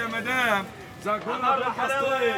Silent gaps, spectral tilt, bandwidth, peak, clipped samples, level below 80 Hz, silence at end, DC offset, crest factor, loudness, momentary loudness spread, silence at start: none; -3.5 dB/octave; over 20 kHz; -8 dBFS; under 0.1%; -62 dBFS; 0 s; under 0.1%; 18 dB; -25 LUFS; 7 LU; 0 s